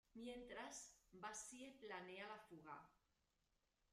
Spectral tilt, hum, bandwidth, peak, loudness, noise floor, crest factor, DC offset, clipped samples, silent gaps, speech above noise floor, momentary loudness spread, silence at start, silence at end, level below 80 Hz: -2.5 dB/octave; none; 15 kHz; -40 dBFS; -56 LUFS; -87 dBFS; 18 dB; under 0.1%; under 0.1%; none; 30 dB; 6 LU; 0.15 s; 0.95 s; -82 dBFS